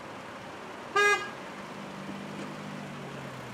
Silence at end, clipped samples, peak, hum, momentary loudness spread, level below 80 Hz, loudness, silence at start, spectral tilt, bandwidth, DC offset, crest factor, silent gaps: 0 s; under 0.1%; -14 dBFS; none; 17 LU; -70 dBFS; -33 LUFS; 0 s; -3.5 dB/octave; 15.5 kHz; under 0.1%; 20 dB; none